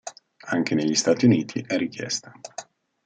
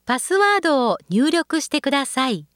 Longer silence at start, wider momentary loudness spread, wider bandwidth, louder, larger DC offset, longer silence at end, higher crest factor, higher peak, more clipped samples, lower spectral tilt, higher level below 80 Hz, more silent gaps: about the same, 0.05 s vs 0.05 s; first, 20 LU vs 5 LU; second, 9.4 kHz vs 17 kHz; second, -23 LUFS vs -19 LUFS; neither; first, 0.45 s vs 0.1 s; about the same, 18 dB vs 14 dB; about the same, -6 dBFS vs -6 dBFS; neither; about the same, -4.5 dB/octave vs -3.5 dB/octave; about the same, -70 dBFS vs -66 dBFS; neither